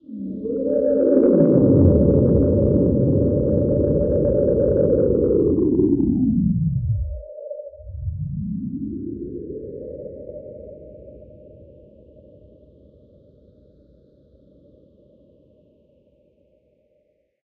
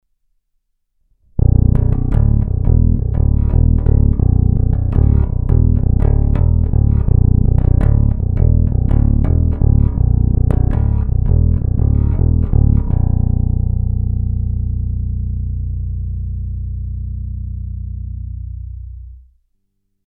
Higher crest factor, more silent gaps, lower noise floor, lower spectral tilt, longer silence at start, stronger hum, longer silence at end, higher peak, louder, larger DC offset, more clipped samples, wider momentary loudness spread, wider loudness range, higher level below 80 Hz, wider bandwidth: about the same, 18 dB vs 14 dB; neither; about the same, -65 dBFS vs -67 dBFS; first, -16.5 dB/octave vs -12.5 dB/octave; second, 0.1 s vs 1.35 s; neither; first, 5.8 s vs 0.9 s; second, -4 dBFS vs 0 dBFS; second, -19 LUFS vs -16 LUFS; neither; neither; first, 20 LU vs 12 LU; first, 19 LU vs 10 LU; second, -34 dBFS vs -16 dBFS; second, 1.8 kHz vs 2.4 kHz